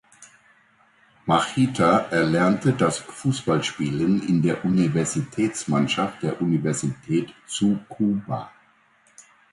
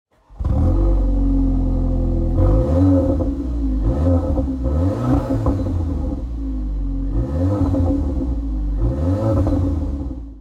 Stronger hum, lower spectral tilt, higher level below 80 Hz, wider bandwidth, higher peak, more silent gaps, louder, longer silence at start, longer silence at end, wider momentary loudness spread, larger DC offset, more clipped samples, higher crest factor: neither; second, -5.5 dB/octave vs -10.5 dB/octave; second, -56 dBFS vs -22 dBFS; first, 11.5 kHz vs 5.2 kHz; about the same, -6 dBFS vs -6 dBFS; neither; second, -23 LUFS vs -20 LUFS; about the same, 0.2 s vs 0.3 s; first, 0.3 s vs 0 s; about the same, 7 LU vs 8 LU; neither; neither; first, 18 dB vs 12 dB